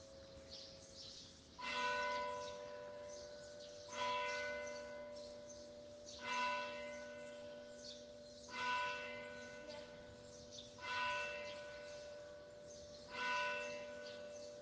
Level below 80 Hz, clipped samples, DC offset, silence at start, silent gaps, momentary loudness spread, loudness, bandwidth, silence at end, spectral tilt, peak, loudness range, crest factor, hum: -74 dBFS; under 0.1%; under 0.1%; 0 s; none; 15 LU; -46 LUFS; 10 kHz; 0 s; -2 dB/octave; -28 dBFS; 3 LU; 20 dB; none